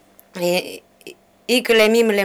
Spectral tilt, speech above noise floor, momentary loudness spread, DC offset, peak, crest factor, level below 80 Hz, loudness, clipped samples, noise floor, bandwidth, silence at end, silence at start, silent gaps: -3.5 dB/octave; 27 dB; 22 LU; under 0.1%; -6 dBFS; 14 dB; -60 dBFS; -17 LUFS; under 0.1%; -43 dBFS; over 20 kHz; 0 s; 0.35 s; none